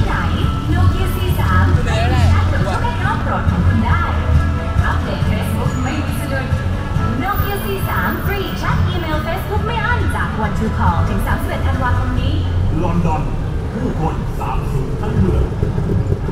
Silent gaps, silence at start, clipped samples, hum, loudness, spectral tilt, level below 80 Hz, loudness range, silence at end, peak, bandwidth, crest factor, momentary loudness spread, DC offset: none; 0 s; under 0.1%; none; -18 LUFS; -7 dB/octave; -24 dBFS; 3 LU; 0 s; -2 dBFS; 16 kHz; 14 dB; 5 LU; under 0.1%